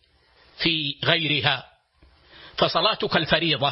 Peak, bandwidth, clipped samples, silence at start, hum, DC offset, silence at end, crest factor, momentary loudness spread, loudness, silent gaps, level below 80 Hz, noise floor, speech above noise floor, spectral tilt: -2 dBFS; 6 kHz; under 0.1%; 0.6 s; none; under 0.1%; 0 s; 22 dB; 5 LU; -22 LUFS; none; -54 dBFS; -58 dBFS; 36 dB; -7.5 dB/octave